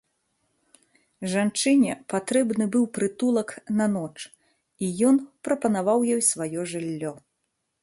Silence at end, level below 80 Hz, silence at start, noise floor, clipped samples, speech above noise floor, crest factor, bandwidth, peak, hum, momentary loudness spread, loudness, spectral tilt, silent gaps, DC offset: 0.65 s; -68 dBFS; 1.2 s; -78 dBFS; under 0.1%; 54 dB; 18 dB; 11.5 kHz; -8 dBFS; none; 11 LU; -24 LUFS; -4.5 dB/octave; none; under 0.1%